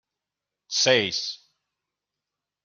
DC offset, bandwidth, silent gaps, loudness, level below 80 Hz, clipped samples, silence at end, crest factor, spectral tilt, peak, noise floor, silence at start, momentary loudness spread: under 0.1%; 7.4 kHz; none; -23 LUFS; -76 dBFS; under 0.1%; 1.3 s; 24 dB; -1.5 dB/octave; -6 dBFS; -87 dBFS; 0.7 s; 15 LU